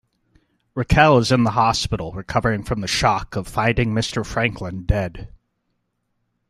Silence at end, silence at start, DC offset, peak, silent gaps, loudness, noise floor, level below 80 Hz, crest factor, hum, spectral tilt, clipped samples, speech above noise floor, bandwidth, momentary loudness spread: 1.2 s; 0.75 s; under 0.1%; 0 dBFS; none; -20 LUFS; -72 dBFS; -34 dBFS; 20 dB; none; -5 dB/octave; under 0.1%; 53 dB; 14 kHz; 13 LU